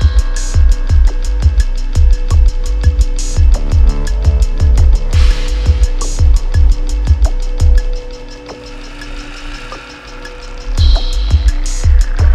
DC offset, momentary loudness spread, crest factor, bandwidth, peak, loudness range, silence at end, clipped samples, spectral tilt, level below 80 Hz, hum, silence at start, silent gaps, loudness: under 0.1%; 16 LU; 10 dB; 9.8 kHz; 0 dBFS; 7 LU; 0 s; under 0.1%; -5.5 dB/octave; -10 dBFS; none; 0 s; none; -14 LUFS